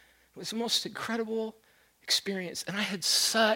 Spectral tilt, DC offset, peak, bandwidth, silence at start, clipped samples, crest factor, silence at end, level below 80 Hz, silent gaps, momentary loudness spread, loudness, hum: -1.5 dB/octave; under 0.1%; -12 dBFS; 16.5 kHz; 0.35 s; under 0.1%; 20 dB; 0 s; -74 dBFS; none; 14 LU; -29 LUFS; none